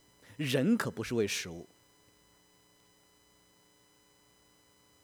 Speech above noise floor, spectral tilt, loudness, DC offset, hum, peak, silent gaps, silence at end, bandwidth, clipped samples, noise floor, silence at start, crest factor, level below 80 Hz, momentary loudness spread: 34 dB; -5 dB/octave; -32 LUFS; under 0.1%; none; -16 dBFS; none; 3.4 s; over 20 kHz; under 0.1%; -66 dBFS; 0.3 s; 20 dB; -70 dBFS; 23 LU